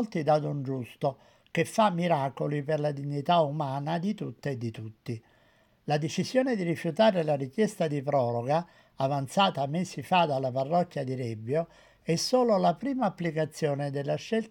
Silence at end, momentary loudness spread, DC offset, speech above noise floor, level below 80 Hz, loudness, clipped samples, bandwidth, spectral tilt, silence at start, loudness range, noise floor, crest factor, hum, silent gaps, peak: 0 s; 10 LU; under 0.1%; 36 dB; -70 dBFS; -29 LUFS; under 0.1%; 17 kHz; -6 dB/octave; 0 s; 3 LU; -64 dBFS; 18 dB; none; none; -10 dBFS